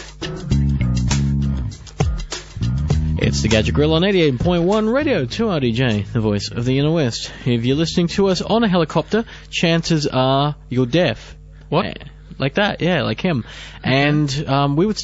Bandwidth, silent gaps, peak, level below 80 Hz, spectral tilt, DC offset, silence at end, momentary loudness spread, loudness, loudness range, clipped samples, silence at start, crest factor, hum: 8 kHz; none; -2 dBFS; -30 dBFS; -6 dB/octave; under 0.1%; 0 s; 8 LU; -18 LUFS; 3 LU; under 0.1%; 0 s; 16 dB; none